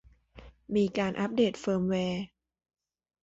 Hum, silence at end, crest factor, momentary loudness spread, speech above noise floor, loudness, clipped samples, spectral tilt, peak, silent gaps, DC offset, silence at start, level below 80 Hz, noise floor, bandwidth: none; 0.95 s; 16 dB; 7 LU; 25 dB; -30 LUFS; under 0.1%; -6.5 dB/octave; -14 dBFS; none; under 0.1%; 0.35 s; -60 dBFS; -53 dBFS; 8 kHz